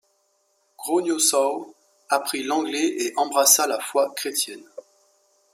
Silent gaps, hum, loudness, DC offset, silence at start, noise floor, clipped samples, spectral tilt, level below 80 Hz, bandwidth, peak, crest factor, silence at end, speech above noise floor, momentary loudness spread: none; none; -21 LUFS; under 0.1%; 0.8 s; -67 dBFS; under 0.1%; -0.5 dB/octave; -80 dBFS; 16 kHz; -2 dBFS; 22 dB; 0.75 s; 45 dB; 11 LU